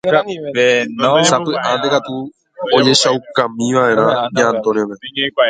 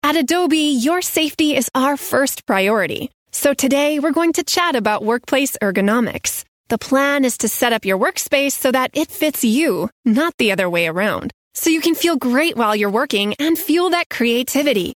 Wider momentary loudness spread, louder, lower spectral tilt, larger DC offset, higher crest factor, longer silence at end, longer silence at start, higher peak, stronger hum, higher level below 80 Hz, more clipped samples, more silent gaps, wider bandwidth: first, 9 LU vs 4 LU; first, -14 LUFS vs -17 LUFS; about the same, -3.5 dB/octave vs -3 dB/octave; neither; about the same, 14 dB vs 16 dB; about the same, 0 s vs 0.05 s; about the same, 0.05 s vs 0.05 s; about the same, 0 dBFS vs -2 dBFS; neither; about the same, -58 dBFS vs -58 dBFS; neither; second, none vs 3.14-3.26 s, 6.48-6.64 s, 9.92-10.03 s, 10.34-10.38 s, 11.34-11.51 s, 14.06-14.10 s; second, 9.4 kHz vs 19.5 kHz